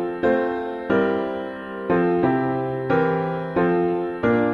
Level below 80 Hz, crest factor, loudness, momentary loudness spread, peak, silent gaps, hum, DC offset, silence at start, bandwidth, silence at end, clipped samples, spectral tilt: -52 dBFS; 14 dB; -22 LUFS; 7 LU; -6 dBFS; none; none; under 0.1%; 0 s; 5.4 kHz; 0 s; under 0.1%; -9 dB/octave